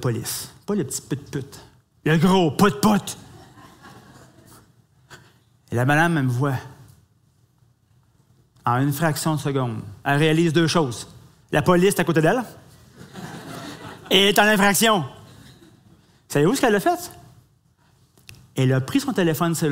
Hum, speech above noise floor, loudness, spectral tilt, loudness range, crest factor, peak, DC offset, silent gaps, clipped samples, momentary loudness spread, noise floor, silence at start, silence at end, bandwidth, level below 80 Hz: none; 41 dB; -20 LUFS; -5 dB/octave; 6 LU; 20 dB; -2 dBFS; under 0.1%; none; under 0.1%; 19 LU; -60 dBFS; 0 s; 0 s; 16 kHz; -54 dBFS